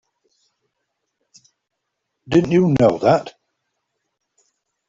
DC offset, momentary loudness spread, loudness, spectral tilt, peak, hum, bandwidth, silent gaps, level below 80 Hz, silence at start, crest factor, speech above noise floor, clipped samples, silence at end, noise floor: under 0.1%; 6 LU; -16 LUFS; -7.5 dB/octave; -2 dBFS; none; 7.6 kHz; none; -54 dBFS; 2.3 s; 20 dB; 62 dB; under 0.1%; 1.6 s; -77 dBFS